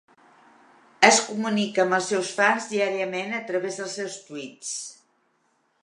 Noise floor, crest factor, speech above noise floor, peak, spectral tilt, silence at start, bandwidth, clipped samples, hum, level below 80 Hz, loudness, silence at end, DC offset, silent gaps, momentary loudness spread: -69 dBFS; 24 dB; 44 dB; 0 dBFS; -2.5 dB/octave; 1 s; 11.5 kHz; under 0.1%; none; -74 dBFS; -24 LUFS; 0.9 s; under 0.1%; none; 16 LU